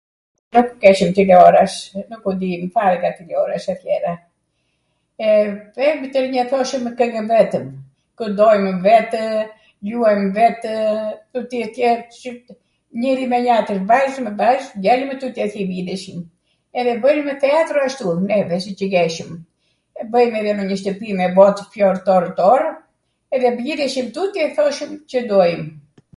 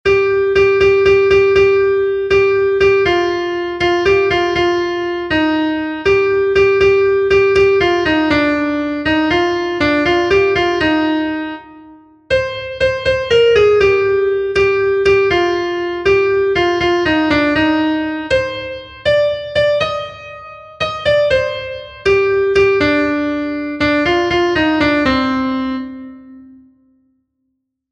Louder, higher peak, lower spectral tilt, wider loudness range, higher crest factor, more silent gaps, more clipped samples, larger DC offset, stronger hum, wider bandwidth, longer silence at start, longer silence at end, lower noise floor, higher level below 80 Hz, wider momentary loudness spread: second, -17 LUFS vs -14 LUFS; about the same, 0 dBFS vs 0 dBFS; about the same, -6 dB/octave vs -5.5 dB/octave; about the same, 5 LU vs 4 LU; about the same, 18 dB vs 14 dB; neither; neither; neither; neither; first, 11.5 kHz vs 8 kHz; first, 0.55 s vs 0.05 s; second, 0.35 s vs 1.45 s; about the same, -68 dBFS vs -71 dBFS; second, -60 dBFS vs -38 dBFS; first, 13 LU vs 9 LU